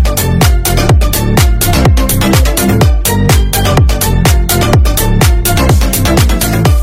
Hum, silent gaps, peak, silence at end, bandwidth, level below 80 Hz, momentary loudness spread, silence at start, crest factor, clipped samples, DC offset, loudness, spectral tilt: none; none; 0 dBFS; 0 s; 17 kHz; -12 dBFS; 1 LU; 0 s; 8 dB; 0.1%; under 0.1%; -9 LUFS; -5 dB/octave